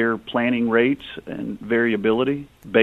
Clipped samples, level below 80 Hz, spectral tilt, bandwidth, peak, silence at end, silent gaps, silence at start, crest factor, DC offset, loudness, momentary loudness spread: under 0.1%; -56 dBFS; -7.5 dB/octave; 4.2 kHz; 0 dBFS; 0 s; none; 0 s; 20 dB; under 0.1%; -22 LUFS; 12 LU